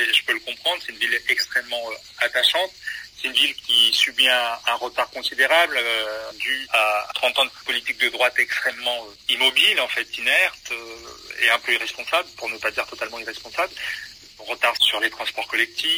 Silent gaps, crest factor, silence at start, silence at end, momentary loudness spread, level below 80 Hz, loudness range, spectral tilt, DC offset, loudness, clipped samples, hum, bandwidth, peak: none; 18 dB; 0 s; 0 s; 13 LU; -62 dBFS; 5 LU; 0.5 dB/octave; under 0.1%; -20 LUFS; under 0.1%; none; 16 kHz; -4 dBFS